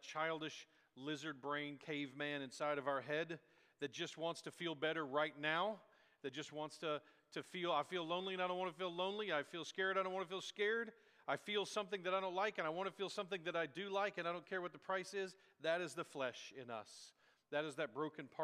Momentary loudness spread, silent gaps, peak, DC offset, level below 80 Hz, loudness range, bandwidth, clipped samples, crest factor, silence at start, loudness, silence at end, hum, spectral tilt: 10 LU; none; -24 dBFS; under 0.1%; under -90 dBFS; 3 LU; 15 kHz; under 0.1%; 20 dB; 0 s; -43 LUFS; 0 s; none; -4 dB/octave